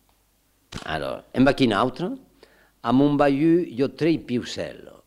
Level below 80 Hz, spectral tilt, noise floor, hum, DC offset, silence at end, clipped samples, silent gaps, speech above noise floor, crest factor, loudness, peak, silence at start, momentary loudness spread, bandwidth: -48 dBFS; -6.5 dB/octave; -64 dBFS; none; under 0.1%; 0.3 s; under 0.1%; none; 43 dB; 20 dB; -23 LUFS; -4 dBFS; 0.7 s; 14 LU; 12 kHz